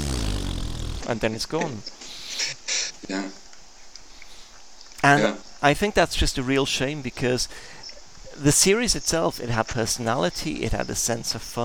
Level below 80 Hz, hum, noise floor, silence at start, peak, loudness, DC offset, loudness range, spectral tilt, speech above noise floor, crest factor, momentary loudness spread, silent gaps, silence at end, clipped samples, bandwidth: -36 dBFS; none; -47 dBFS; 0 s; -2 dBFS; -24 LUFS; 0.6%; 6 LU; -3.5 dB/octave; 24 dB; 22 dB; 19 LU; none; 0 s; under 0.1%; 19 kHz